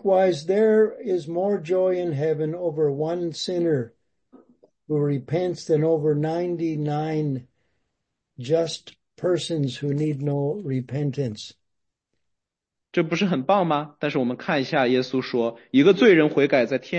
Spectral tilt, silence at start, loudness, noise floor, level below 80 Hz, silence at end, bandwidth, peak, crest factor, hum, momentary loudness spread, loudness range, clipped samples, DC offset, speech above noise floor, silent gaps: -6.5 dB/octave; 0.05 s; -23 LUFS; -84 dBFS; -68 dBFS; 0 s; 8.8 kHz; -4 dBFS; 18 dB; none; 9 LU; 7 LU; under 0.1%; under 0.1%; 62 dB; none